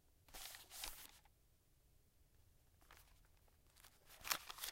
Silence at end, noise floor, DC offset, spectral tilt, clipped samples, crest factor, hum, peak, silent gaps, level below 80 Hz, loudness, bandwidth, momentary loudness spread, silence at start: 0 s; -74 dBFS; under 0.1%; 0.5 dB/octave; under 0.1%; 36 dB; none; -20 dBFS; none; -70 dBFS; -49 LUFS; 16.5 kHz; 23 LU; 0.05 s